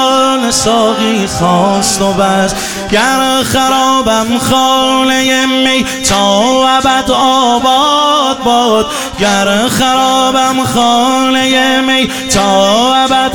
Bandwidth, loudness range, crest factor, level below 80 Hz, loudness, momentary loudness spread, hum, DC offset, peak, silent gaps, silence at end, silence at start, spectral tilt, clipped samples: 20 kHz; 1 LU; 10 dB; -36 dBFS; -9 LUFS; 3 LU; none; 0.9%; 0 dBFS; none; 0 s; 0 s; -3 dB/octave; under 0.1%